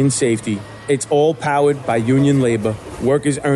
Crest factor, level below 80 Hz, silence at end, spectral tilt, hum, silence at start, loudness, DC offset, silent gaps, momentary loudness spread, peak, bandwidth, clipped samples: 10 dB; -48 dBFS; 0 s; -6 dB/octave; none; 0 s; -17 LUFS; under 0.1%; none; 7 LU; -6 dBFS; 12 kHz; under 0.1%